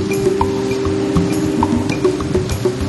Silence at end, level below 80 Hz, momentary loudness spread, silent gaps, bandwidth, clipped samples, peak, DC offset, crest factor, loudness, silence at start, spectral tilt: 0 s; -32 dBFS; 2 LU; none; 12.5 kHz; under 0.1%; -2 dBFS; under 0.1%; 16 dB; -17 LUFS; 0 s; -6.5 dB/octave